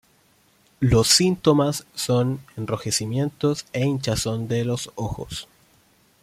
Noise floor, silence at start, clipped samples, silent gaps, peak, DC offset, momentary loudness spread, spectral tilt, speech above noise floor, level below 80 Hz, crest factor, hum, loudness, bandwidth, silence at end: -60 dBFS; 0.8 s; under 0.1%; none; -2 dBFS; under 0.1%; 14 LU; -4.5 dB/octave; 38 dB; -44 dBFS; 20 dB; none; -22 LUFS; 16 kHz; 0.8 s